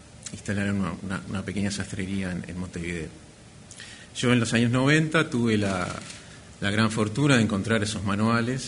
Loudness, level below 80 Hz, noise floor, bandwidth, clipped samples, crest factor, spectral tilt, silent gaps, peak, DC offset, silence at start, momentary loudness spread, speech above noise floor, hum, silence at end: -25 LUFS; -52 dBFS; -47 dBFS; 11 kHz; under 0.1%; 20 dB; -5.5 dB/octave; none; -6 dBFS; under 0.1%; 0.05 s; 18 LU; 22 dB; none; 0 s